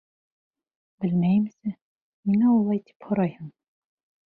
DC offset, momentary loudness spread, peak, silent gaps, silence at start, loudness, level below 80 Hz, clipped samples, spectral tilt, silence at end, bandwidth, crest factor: under 0.1%; 15 LU; -12 dBFS; 1.82-2.23 s, 2.95-3.00 s; 1 s; -25 LUFS; -66 dBFS; under 0.1%; -11.5 dB/octave; 0.8 s; 4.3 kHz; 14 dB